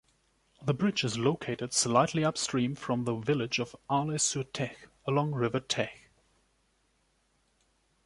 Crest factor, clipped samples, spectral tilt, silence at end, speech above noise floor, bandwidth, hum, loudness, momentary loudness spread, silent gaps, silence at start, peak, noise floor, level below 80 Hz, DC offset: 22 dB; under 0.1%; -4 dB/octave; 2.1 s; 42 dB; 11.5 kHz; none; -30 LUFS; 9 LU; none; 0.6 s; -10 dBFS; -72 dBFS; -66 dBFS; under 0.1%